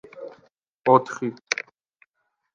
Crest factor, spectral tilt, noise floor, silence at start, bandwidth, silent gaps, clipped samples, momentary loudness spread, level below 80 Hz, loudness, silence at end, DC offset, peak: 24 dB; -4.5 dB/octave; -76 dBFS; 0.15 s; 7.6 kHz; 0.68-0.82 s; under 0.1%; 22 LU; -74 dBFS; -23 LUFS; 1 s; under 0.1%; -2 dBFS